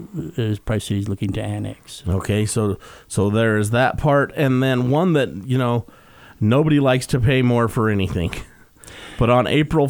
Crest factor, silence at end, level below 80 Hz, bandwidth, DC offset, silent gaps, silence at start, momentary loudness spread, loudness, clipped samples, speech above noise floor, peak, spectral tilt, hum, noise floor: 16 dB; 0 s; -40 dBFS; 19.5 kHz; under 0.1%; none; 0 s; 11 LU; -19 LUFS; under 0.1%; 24 dB; -4 dBFS; -6.5 dB/octave; none; -42 dBFS